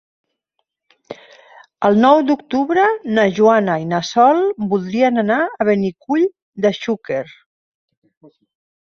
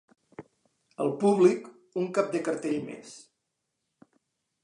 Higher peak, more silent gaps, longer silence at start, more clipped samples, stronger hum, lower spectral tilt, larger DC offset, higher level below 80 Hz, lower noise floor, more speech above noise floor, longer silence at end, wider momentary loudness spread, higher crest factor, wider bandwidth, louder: first, -2 dBFS vs -10 dBFS; first, 6.42-6.53 s vs none; first, 1.1 s vs 0.4 s; neither; neither; about the same, -6 dB/octave vs -6.5 dB/octave; neither; first, -62 dBFS vs -80 dBFS; second, -73 dBFS vs -82 dBFS; about the same, 58 dB vs 55 dB; about the same, 1.55 s vs 1.45 s; second, 12 LU vs 21 LU; about the same, 16 dB vs 20 dB; second, 7.2 kHz vs 11 kHz; first, -16 LUFS vs -27 LUFS